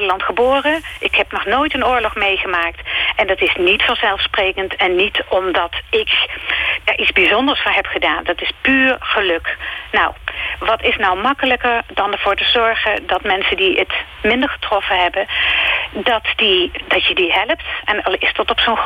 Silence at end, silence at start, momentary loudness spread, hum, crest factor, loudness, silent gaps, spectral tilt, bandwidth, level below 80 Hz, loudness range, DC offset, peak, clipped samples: 0 s; 0 s; 6 LU; none; 16 dB; -15 LUFS; none; -4.5 dB/octave; 16 kHz; -40 dBFS; 2 LU; under 0.1%; 0 dBFS; under 0.1%